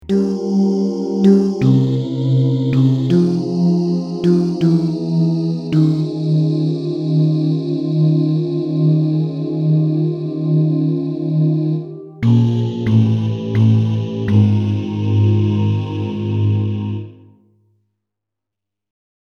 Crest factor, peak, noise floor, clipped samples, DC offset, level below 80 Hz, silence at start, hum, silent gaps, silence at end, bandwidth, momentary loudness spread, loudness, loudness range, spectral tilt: 14 dB; -2 dBFS; -84 dBFS; under 0.1%; under 0.1%; -54 dBFS; 0.05 s; none; none; 2.25 s; 7 kHz; 6 LU; -16 LUFS; 4 LU; -9.5 dB/octave